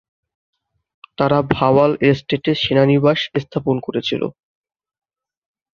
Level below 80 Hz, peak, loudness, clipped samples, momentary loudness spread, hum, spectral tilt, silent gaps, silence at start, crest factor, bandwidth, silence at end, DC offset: -50 dBFS; -2 dBFS; -17 LUFS; under 0.1%; 8 LU; none; -7.5 dB/octave; none; 1.2 s; 18 dB; 7 kHz; 1.45 s; under 0.1%